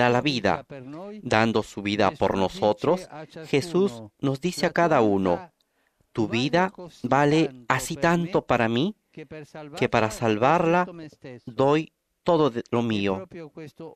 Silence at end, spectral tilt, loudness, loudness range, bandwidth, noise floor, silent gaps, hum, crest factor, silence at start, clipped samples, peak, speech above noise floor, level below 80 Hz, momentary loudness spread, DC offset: 0.05 s; -6 dB/octave; -24 LUFS; 1 LU; 14.5 kHz; -69 dBFS; none; none; 22 dB; 0 s; under 0.1%; -4 dBFS; 45 dB; -56 dBFS; 19 LU; under 0.1%